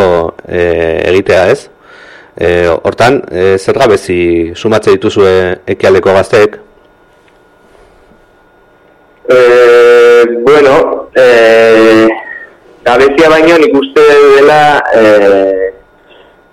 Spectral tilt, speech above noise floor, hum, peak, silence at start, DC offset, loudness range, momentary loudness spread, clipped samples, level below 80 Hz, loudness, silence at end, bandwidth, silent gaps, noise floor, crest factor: -5.5 dB/octave; 38 dB; none; 0 dBFS; 0 s; under 0.1%; 7 LU; 9 LU; under 0.1%; -38 dBFS; -6 LUFS; 0.8 s; 13 kHz; none; -44 dBFS; 8 dB